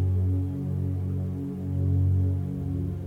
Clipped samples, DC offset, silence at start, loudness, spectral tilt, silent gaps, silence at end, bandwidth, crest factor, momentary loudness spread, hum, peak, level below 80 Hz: under 0.1%; under 0.1%; 0 s; -28 LUFS; -11 dB/octave; none; 0 s; 2.3 kHz; 10 dB; 6 LU; none; -16 dBFS; -50 dBFS